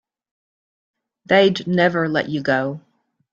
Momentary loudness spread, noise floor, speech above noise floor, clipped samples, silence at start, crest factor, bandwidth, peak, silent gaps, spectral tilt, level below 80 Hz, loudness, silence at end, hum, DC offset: 8 LU; under -90 dBFS; over 72 dB; under 0.1%; 1.3 s; 20 dB; 7.4 kHz; -2 dBFS; none; -6.5 dB/octave; -62 dBFS; -18 LUFS; 0.55 s; none; under 0.1%